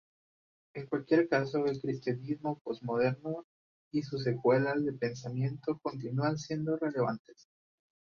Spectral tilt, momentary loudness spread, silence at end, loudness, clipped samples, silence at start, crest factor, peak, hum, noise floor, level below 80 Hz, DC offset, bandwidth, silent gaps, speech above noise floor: -7.5 dB/octave; 10 LU; 0.85 s; -33 LUFS; under 0.1%; 0.75 s; 20 dB; -14 dBFS; none; under -90 dBFS; -72 dBFS; under 0.1%; 7.2 kHz; 2.61-2.65 s, 3.44-3.91 s, 7.19-7.25 s; over 58 dB